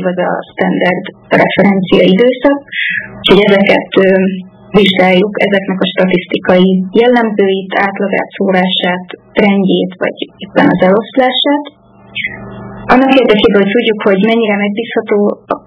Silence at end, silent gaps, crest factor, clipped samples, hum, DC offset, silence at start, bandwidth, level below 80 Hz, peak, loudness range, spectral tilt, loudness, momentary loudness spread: 0.1 s; none; 10 dB; 1%; none; under 0.1%; 0 s; 5.4 kHz; -44 dBFS; 0 dBFS; 3 LU; -8 dB/octave; -10 LUFS; 10 LU